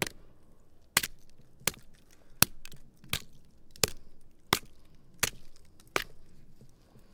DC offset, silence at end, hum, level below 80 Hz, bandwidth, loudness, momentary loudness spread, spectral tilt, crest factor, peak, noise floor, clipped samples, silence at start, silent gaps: under 0.1%; 0 s; none; -54 dBFS; 18 kHz; -32 LUFS; 11 LU; -1.5 dB/octave; 36 dB; 0 dBFS; -54 dBFS; under 0.1%; 0 s; none